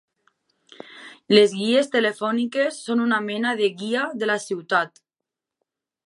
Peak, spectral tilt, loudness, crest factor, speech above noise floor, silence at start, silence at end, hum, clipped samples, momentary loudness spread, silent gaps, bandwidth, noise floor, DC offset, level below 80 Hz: -2 dBFS; -4 dB/octave; -22 LUFS; 22 dB; 65 dB; 0.9 s; 1.2 s; none; under 0.1%; 14 LU; none; 11.5 kHz; -86 dBFS; under 0.1%; -78 dBFS